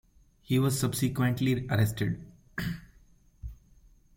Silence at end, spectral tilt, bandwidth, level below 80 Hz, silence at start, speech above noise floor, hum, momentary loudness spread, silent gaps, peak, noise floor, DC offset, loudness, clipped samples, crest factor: 0.65 s; -6 dB/octave; 16.5 kHz; -50 dBFS; 0.5 s; 32 dB; none; 20 LU; none; -12 dBFS; -60 dBFS; under 0.1%; -29 LUFS; under 0.1%; 18 dB